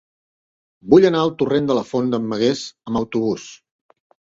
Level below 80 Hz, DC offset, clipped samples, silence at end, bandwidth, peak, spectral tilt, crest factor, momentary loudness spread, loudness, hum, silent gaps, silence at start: -54 dBFS; under 0.1%; under 0.1%; 0.8 s; 7.8 kHz; 0 dBFS; -6 dB/octave; 20 dB; 14 LU; -19 LUFS; none; none; 0.85 s